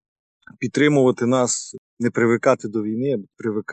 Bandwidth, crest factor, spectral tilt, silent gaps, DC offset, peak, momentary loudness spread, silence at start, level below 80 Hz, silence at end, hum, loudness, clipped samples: 9.4 kHz; 16 dB; -5 dB/octave; 1.78-1.97 s; under 0.1%; -4 dBFS; 10 LU; 0.6 s; -66 dBFS; 0 s; none; -20 LUFS; under 0.1%